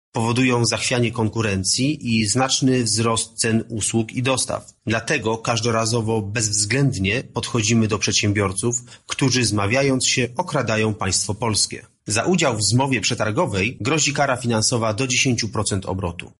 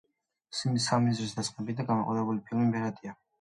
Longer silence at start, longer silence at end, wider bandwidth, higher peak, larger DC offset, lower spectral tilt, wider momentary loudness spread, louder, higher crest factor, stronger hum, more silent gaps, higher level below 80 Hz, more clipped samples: second, 0.15 s vs 0.5 s; second, 0.1 s vs 0.25 s; about the same, 11.5 kHz vs 11.5 kHz; first, -4 dBFS vs -14 dBFS; neither; second, -4 dB/octave vs -5.5 dB/octave; second, 5 LU vs 10 LU; first, -20 LUFS vs -30 LUFS; about the same, 16 dB vs 18 dB; neither; neither; first, -50 dBFS vs -68 dBFS; neither